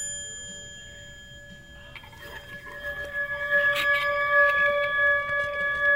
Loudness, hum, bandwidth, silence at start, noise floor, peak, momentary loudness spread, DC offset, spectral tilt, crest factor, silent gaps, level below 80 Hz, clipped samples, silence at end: -23 LUFS; none; 16 kHz; 0 s; -46 dBFS; -10 dBFS; 23 LU; under 0.1%; -1 dB/octave; 16 dB; none; -52 dBFS; under 0.1%; 0 s